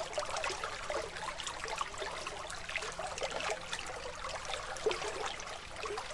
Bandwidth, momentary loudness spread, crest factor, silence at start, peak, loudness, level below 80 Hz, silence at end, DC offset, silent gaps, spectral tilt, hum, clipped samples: 11.5 kHz; 5 LU; 20 dB; 0 s; -20 dBFS; -39 LUFS; -56 dBFS; 0 s; under 0.1%; none; -1.5 dB/octave; none; under 0.1%